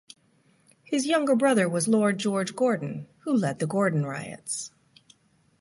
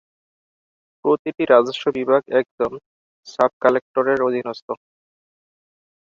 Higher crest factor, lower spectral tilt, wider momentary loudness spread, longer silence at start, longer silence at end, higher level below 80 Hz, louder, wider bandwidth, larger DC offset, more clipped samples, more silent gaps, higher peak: about the same, 16 dB vs 20 dB; about the same, -5 dB/octave vs -5.5 dB/octave; second, 11 LU vs 16 LU; second, 0.9 s vs 1.05 s; second, 0.95 s vs 1.35 s; second, -72 dBFS vs -64 dBFS; second, -26 LUFS vs -20 LUFS; first, 11.5 kHz vs 7.4 kHz; neither; neither; second, none vs 1.19-1.25 s, 2.51-2.58 s, 2.86-3.23 s, 3.53-3.61 s, 3.82-3.94 s, 4.62-4.68 s; second, -10 dBFS vs -2 dBFS